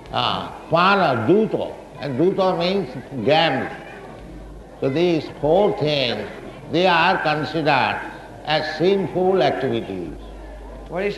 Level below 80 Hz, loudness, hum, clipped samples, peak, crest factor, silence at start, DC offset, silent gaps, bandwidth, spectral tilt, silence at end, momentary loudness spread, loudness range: -46 dBFS; -20 LUFS; none; under 0.1%; -2 dBFS; 18 dB; 0 s; under 0.1%; none; 12 kHz; -6.5 dB/octave; 0 s; 20 LU; 3 LU